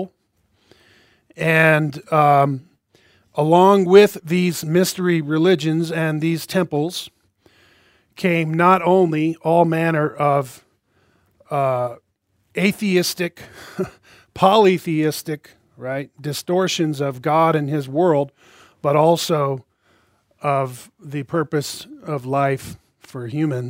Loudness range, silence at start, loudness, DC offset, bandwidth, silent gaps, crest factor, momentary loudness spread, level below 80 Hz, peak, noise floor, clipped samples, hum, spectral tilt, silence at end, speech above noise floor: 7 LU; 0 s; -18 LUFS; under 0.1%; 16 kHz; none; 20 dB; 16 LU; -62 dBFS; 0 dBFS; -66 dBFS; under 0.1%; none; -6 dB/octave; 0 s; 48 dB